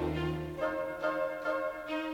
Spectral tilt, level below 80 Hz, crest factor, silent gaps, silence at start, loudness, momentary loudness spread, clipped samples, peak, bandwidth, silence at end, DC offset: -7 dB/octave; -54 dBFS; 14 dB; none; 0 s; -35 LUFS; 3 LU; under 0.1%; -20 dBFS; 19.5 kHz; 0 s; under 0.1%